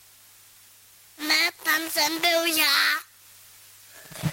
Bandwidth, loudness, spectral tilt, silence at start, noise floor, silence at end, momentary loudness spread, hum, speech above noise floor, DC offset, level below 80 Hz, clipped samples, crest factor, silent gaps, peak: 16.5 kHz; -22 LUFS; -1.5 dB/octave; 1.2 s; -53 dBFS; 0 s; 13 LU; none; 30 dB; under 0.1%; -64 dBFS; under 0.1%; 20 dB; none; -6 dBFS